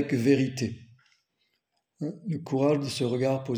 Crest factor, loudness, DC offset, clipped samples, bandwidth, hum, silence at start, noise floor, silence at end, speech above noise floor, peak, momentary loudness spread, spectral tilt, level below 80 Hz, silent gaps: 20 dB; -28 LUFS; under 0.1%; under 0.1%; 20 kHz; none; 0 s; -77 dBFS; 0 s; 51 dB; -10 dBFS; 13 LU; -6.5 dB/octave; -68 dBFS; none